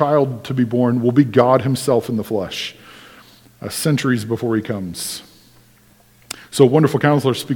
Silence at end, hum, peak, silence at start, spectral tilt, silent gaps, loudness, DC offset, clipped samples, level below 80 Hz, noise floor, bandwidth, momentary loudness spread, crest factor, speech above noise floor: 0 s; none; 0 dBFS; 0 s; -6 dB/octave; none; -18 LUFS; under 0.1%; under 0.1%; -58 dBFS; -52 dBFS; 19 kHz; 13 LU; 18 dB; 35 dB